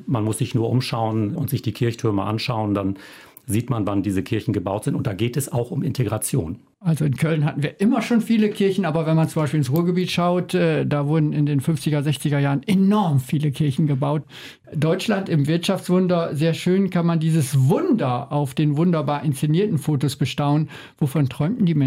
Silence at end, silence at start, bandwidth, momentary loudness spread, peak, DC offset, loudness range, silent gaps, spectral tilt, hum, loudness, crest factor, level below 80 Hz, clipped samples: 0 s; 0 s; 16 kHz; 5 LU; -10 dBFS; under 0.1%; 4 LU; none; -7 dB/octave; none; -21 LUFS; 10 dB; -56 dBFS; under 0.1%